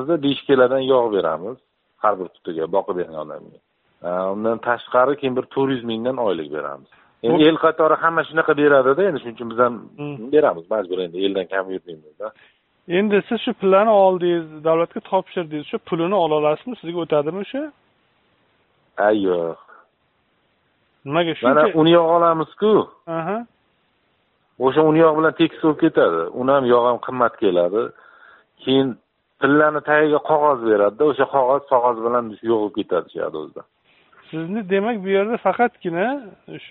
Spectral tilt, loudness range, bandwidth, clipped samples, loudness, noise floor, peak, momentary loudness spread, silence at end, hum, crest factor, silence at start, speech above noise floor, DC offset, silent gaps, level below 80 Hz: -4 dB/octave; 6 LU; 4.2 kHz; under 0.1%; -19 LUFS; -65 dBFS; -2 dBFS; 14 LU; 0.05 s; none; 18 dB; 0 s; 47 dB; under 0.1%; none; -64 dBFS